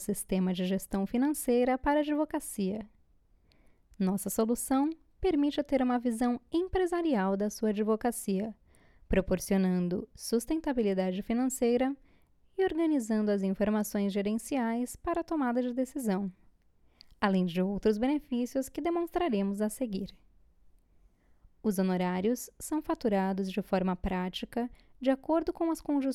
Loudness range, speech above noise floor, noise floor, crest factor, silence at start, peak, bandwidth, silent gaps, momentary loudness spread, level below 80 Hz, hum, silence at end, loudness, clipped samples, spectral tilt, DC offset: 3 LU; 35 dB; -65 dBFS; 18 dB; 0 s; -14 dBFS; 15.5 kHz; none; 6 LU; -52 dBFS; none; 0 s; -31 LUFS; under 0.1%; -6 dB/octave; under 0.1%